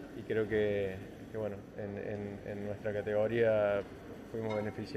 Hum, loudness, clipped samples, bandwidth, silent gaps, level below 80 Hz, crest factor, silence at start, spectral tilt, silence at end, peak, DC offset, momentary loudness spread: none; -35 LUFS; under 0.1%; 14 kHz; none; -62 dBFS; 16 dB; 0 s; -7.5 dB/octave; 0 s; -20 dBFS; under 0.1%; 14 LU